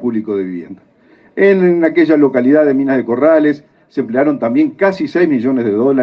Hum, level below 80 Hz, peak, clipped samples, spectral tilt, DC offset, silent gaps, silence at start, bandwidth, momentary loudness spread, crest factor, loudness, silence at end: none; -62 dBFS; 0 dBFS; under 0.1%; -9 dB/octave; under 0.1%; none; 0 s; 6.2 kHz; 11 LU; 12 dB; -13 LUFS; 0 s